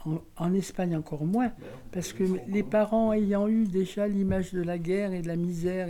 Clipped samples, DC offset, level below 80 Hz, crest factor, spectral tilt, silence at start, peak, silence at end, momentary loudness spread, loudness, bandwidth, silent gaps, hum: under 0.1%; under 0.1%; -50 dBFS; 14 dB; -7.5 dB/octave; 0 s; -14 dBFS; 0 s; 7 LU; -28 LUFS; 15.5 kHz; none; none